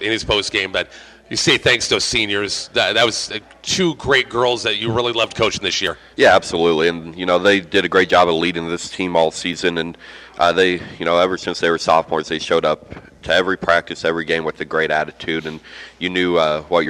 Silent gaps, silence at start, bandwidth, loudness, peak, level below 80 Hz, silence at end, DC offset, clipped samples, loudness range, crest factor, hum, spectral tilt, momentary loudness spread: none; 0 s; 14.5 kHz; -17 LUFS; -2 dBFS; -48 dBFS; 0 s; under 0.1%; under 0.1%; 3 LU; 16 dB; none; -3.5 dB/octave; 10 LU